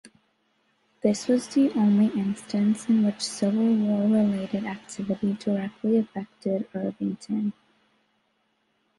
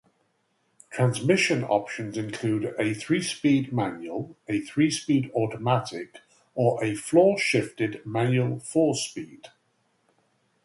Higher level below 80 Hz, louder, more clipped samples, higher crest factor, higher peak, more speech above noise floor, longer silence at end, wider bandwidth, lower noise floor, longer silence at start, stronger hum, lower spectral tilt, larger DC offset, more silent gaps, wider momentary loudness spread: about the same, -68 dBFS vs -66 dBFS; about the same, -25 LUFS vs -25 LUFS; neither; about the same, 18 dB vs 20 dB; about the same, -8 dBFS vs -6 dBFS; about the same, 47 dB vs 46 dB; first, 1.5 s vs 1.15 s; about the same, 11.5 kHz vs 11.5 kHz; about the same, -71 dBFS vs -71 dBFS; second, 0.05 s vs 0.9 s; neither; about the same, -6.5 dB/octave vs -5.5 dB/octave; neither; neither; second, 10 LU vs 13 LU